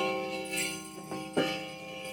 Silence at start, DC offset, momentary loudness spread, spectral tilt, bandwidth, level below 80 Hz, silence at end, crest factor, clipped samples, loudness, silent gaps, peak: 0 s; under 0.1%; 9 LU; -3 dB/octave; 17.5 kHz; -66 dBFS; 0 s; 20 dB; under 0.1%; -34 LUFS; none; -16 dBFS